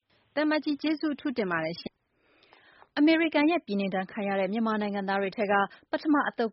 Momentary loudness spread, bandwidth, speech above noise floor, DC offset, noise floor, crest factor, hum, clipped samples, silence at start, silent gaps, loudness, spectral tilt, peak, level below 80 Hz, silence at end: 8 LU; 5.8 kHz; 41 dB; under 0.1%; -68 dBFS; 18 dB; none; under 0.1%; 0.35 s; none; -28 LUFS; -3.5 dB/octave; -12 dBFS; -72 dBFS; 0 s